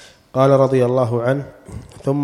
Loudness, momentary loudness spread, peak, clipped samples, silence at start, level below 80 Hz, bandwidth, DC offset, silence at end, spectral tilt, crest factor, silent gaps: -17 LUFS; 21 LU; -2 dBFS; under 0.1%; 0.35 s; -48 dBFS; 12 kHz; under 0.1%; 0 s; -8 dB/octave; 16 dB; none